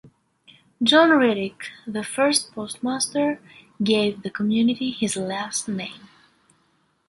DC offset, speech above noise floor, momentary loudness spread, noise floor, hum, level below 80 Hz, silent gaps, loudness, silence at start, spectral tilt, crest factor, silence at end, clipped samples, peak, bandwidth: under 0.1%; 44 dB; 15 LU; -66 dBFS; none; -64 dBFS; none; -22 LUFS; 0.05 s; -3.5 dB/octave; 20 dB; 1.1 s; under 0.1%; -2 dBFS; 12 kHz